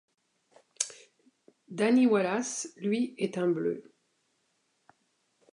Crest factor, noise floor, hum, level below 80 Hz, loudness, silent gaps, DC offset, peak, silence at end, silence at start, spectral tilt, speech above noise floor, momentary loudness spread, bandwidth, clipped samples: 22 dB; -75 dBFS; none; -84 dBFS; -29 LUFS; none; under 0.1%; -10 dBFS; 1.75 s; 0.8 s; -4.5 dB/octave; 47 dB; 11 LU; 11 kHz; under 0.1%